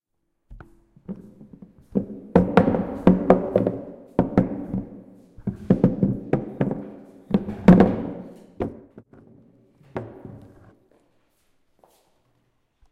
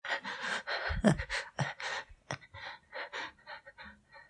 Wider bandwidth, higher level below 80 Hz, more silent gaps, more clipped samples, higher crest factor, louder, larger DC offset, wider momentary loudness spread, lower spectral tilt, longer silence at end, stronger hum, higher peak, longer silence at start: second, 5.4 kHz vs 11 kHz; first, -44 dBFS vs -52 dBFS; neither; neither; about the same, 24 dB vs 26 dB; first, -22 LUFS vs -36 LUFS; neither; first, 22 LU vs 19 LU; first, -10 dB/octave vs -5 dB/octave; first, 2.55 s vs 0.05 s; neither; first, 0 dBFS vs -10 dBFS; first, 0.5 s vs 0.05 s